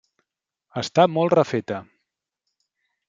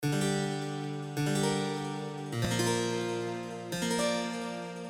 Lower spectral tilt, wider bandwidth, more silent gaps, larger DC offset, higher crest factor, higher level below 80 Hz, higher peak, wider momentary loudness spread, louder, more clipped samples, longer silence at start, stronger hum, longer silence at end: first, -6 dB/octave vs -4.5 dB/octave; second, 7.8 kHz vs 18 kHz; neither; neither; first, 22 dB vs 16 dB; second, -70 dBFS vs -60 dBFS; first, -2 dBFS vs -18 dBFS; first, 15 LU vs 8 LU; first, -21 LUFS vs -32 LUFS; neither; first, 0.75 s vs 0 s; neither; first, 1.25 s vs 0 s